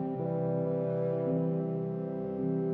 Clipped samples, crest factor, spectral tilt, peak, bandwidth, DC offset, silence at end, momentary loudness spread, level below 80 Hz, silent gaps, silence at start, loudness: under 0.1%; 10 dB; -12.5 dB/octave; -20 dBFS; 3.3 kHz; under 0.1%; 0 s; 4 LU; -66 dBFS; none; 0 s; -32 LUFS